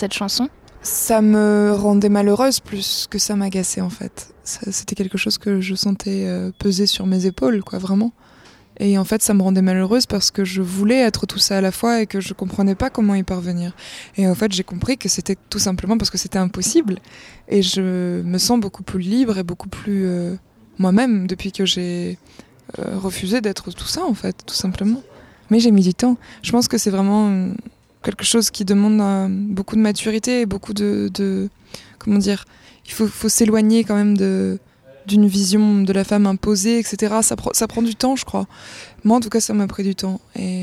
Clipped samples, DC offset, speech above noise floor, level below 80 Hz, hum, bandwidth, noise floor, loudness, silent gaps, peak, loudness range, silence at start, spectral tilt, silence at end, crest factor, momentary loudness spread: under 0.1%; under 0.1%; 29 dB; -46 dBFS; none; 16 kHz; -47 dBFS; -18 LUFS; none; -2 dBFS; 4 LU; 0 s; -4.5 dB/octave; 0 s; 16 dB; 11 LU